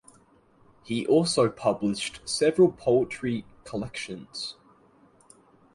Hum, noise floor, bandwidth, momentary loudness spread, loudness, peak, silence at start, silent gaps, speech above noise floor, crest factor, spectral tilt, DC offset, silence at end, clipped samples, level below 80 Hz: none; -60 dBFS; 11.5 kHz; 14 LU; -26 LUFS; -8 dBFS; 0.9 s; none; 34 dB; 20 dB; -5 dB/octave; under 0.1%; 1.2 s; under 0.1%; -60 dBFS